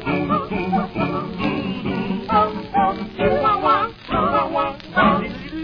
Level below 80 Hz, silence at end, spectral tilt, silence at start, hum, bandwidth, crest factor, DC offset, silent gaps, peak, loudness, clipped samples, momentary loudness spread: -42 dBFS; 0 s; -8.5 dB/octave; 0 s; none; 5.4 kHz; 16 dB; under 0.1%; none; -4 dBFS; -20 LUFS; under 0.1%; 6 LU